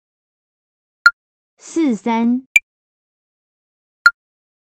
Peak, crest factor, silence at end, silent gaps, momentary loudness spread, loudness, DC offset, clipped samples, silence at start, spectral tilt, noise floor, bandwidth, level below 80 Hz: 0 dBFS; 20 dB; 0.6 s; 1.13-1.57 s, 2.46-2.55 s, 2.63-4.05 s; 4 LU; -16 LUFS; under 0.1%; under 0.1%; 1.05 s; -3 dB/octave; under -90 dBFS; 9.4 kHz; -64 dBFS